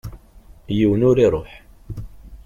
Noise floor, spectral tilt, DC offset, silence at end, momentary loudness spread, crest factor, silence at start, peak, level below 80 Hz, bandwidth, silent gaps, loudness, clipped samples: -46 dBFS; -8.5 dB/octave; under 0.1%; 0.1 s; 21 LU; 16 dB; 0.05 s; -4 dBFS; -38 dBFS; 13.5 kHz; none; -18 LUFS; under 0.1%